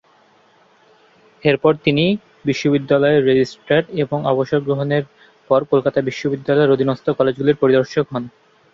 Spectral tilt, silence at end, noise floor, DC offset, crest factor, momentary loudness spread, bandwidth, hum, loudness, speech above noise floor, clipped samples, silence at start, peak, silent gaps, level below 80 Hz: -7 dB/octave; 0.45 s; -54 dBFS; under 0.1%; 16 dB; 7 LU; 7.4 kHz; none; -17 LUFS; 37 dB; under 0.1%; 1.45 s; -2 dBFS; none; -56 dBFS